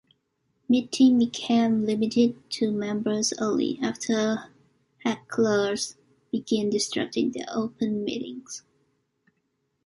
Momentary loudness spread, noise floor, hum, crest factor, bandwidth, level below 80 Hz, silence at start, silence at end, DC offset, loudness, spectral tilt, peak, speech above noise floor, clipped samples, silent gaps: 11 LU; -75 dBFS; none; 18 dB; 11.5 kHz; -68 dBFS; 0.7 s; 1.25 s; under 0.1%; -26 LUFS; -4.5 dB/octave; -10 dBFS; 50 dB; under 0.1%; none